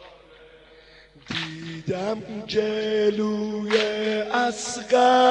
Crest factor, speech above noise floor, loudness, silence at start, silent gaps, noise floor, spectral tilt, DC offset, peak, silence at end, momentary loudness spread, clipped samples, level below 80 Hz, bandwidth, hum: 16 dB; 28 dB; -24 LUFS; 0 s; none; -51 dBFS; -4 dB/octave; under 0.1%; -8 dBFS; 0 s; 11 LU; under 0.1%; -60 dBFS; 10.5 kHz; none